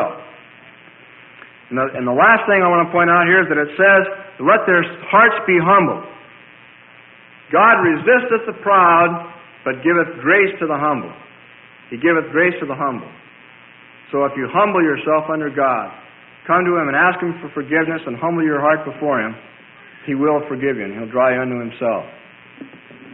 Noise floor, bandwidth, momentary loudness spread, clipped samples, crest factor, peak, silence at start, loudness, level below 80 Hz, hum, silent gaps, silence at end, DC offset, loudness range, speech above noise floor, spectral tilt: -44 dBFS; 4 kHz; 14 LU; under 0.1%; 16 dB; -2 dBFS; 0 s; -16 LUFS; -60 dBFS; none; none; 0.05 s; under 0.1%; 7 LU; 29 dB; -11 dB/octave